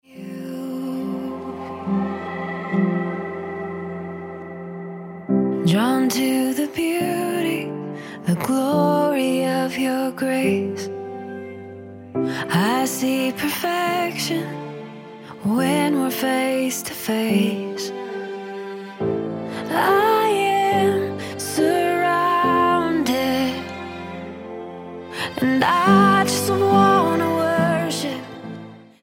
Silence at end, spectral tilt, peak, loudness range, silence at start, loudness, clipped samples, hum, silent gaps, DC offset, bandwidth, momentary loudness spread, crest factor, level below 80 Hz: 0.2 s; -5 dB/octave; -4 dBFS; 8 LU; 0.1 s; -21 LUFS; under 0.1%; none; none; under 0.1%; 17 kHz; 16 LU; 18 dB; -62 dBFS